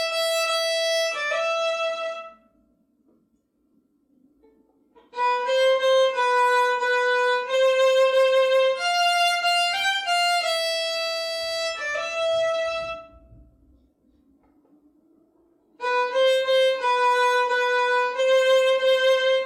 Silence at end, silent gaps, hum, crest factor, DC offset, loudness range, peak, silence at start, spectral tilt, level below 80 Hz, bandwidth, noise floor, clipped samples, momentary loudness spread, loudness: 0 s; none; none; 14 dB; under 0.1%; 12 LU; -10 dBFS; 0 s; 1 dB/octave; -66 dBFS; 15.5 kHz; -68 dBFS; under 0.1%; 7 LU; -21 LUFS